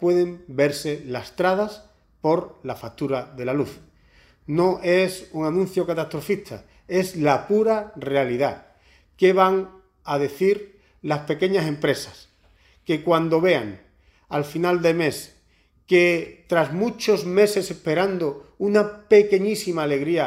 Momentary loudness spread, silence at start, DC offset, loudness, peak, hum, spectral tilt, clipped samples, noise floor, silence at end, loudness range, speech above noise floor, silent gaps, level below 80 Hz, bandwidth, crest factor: 11 LU; 0 s; under 0.1%; -22 LUFS; -4 dBFS; none; -5.5 dB/octave; under 0.1%; -60 dBFS; 0 s; 5 LU; 39 dB; none; -58 dBFS; 16 kHz; 18 dB